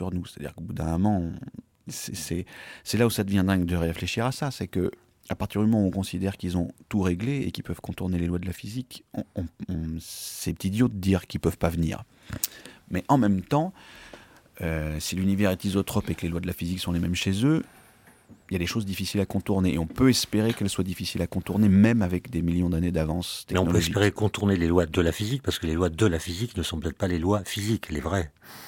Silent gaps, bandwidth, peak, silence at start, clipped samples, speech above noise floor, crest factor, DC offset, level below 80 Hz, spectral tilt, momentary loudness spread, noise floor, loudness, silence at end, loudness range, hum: none; 17 kHz; -4 dBFS; 0 s; under 0.1%; 29 dB; 22 dB; under 0.1%; -44 dBFS; -6 dB/octave; 12 LU; -55 dBFS; -27 LUFS; 0 s; 6 LU; none